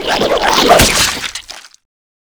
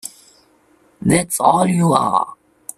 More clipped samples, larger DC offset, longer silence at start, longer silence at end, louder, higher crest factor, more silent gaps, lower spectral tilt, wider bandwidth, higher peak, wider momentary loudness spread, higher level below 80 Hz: first, 0.4% vs under 0.1%; neither; about the same, 0 s vs 0.05 s; first, 0.6 s vs 0.45 s; first, -10 LUFS vs -16 LUFS; about the same, 14 dB vs 18 dB; neither; second, -2 dB/octave vs -5.5 dB/octave; first, over 20 kHz vs 15 kHz; about the same, 0 dBFS vs 0 dBFS; about the same, 17 LU vs 15 LU; first, -30 dBFS vs -50 dBFS